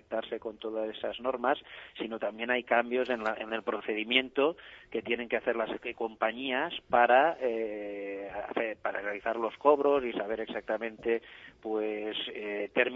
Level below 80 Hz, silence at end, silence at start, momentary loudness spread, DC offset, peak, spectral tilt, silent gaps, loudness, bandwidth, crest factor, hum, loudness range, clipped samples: -68 dBFS; 0 s; 0.1 s; 12 LU; under 0.1%; -8 dBFS; -5.5 dB/octave; none; -31 LUFS; 7.2 kHz; 22 dB; none; 3 LU; under 0.1%